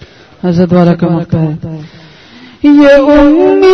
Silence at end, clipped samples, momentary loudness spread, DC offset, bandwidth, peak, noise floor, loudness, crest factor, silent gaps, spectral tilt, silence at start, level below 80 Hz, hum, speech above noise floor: 0 s; 2%; 15 LU; under 0.1%; 6.4 kHz; 0 dBFS; -35 dBFS; -7 LUFS; 8 dB; none; -8.5 dB/octave; 0.45 s; -32 dBFS; none; 29 dB